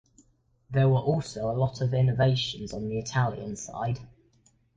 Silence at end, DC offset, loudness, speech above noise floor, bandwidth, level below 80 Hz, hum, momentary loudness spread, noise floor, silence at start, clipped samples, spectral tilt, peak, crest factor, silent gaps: 0.7 s; under 0.1%; -28 LUFS; 38 dB; 8 kHz; -54 dBFS; none; 11 LU; -65 dBFS; 0.7 s; under 0.1%; -6 dB/octave; -12 dBFS; 16 dB; none